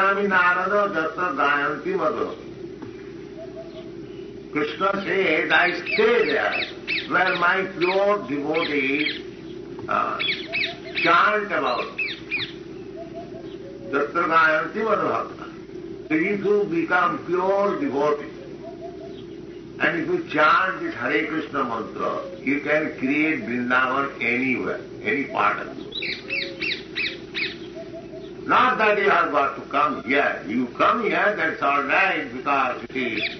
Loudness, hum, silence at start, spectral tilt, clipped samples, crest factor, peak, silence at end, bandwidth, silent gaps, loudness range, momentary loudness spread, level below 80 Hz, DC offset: -22 LUFS; none; 0 s; -2 dB/octave; under 0.1%; 18 dB; -6 dBFS; 0 s; 6.4 kHz; none; 5 LU; 18 LU; -58 dBFS; under 0.1%